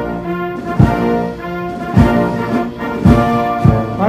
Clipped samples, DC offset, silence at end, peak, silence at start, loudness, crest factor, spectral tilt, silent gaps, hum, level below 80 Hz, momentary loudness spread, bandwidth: 0.3%; under 0.1%; 0 s; 0 dBFS; 0 s; -15 LUFS; 14 dB; -8.5 dB/octave; none; none; -26 dBFS; 10 LU; 15.5 kHz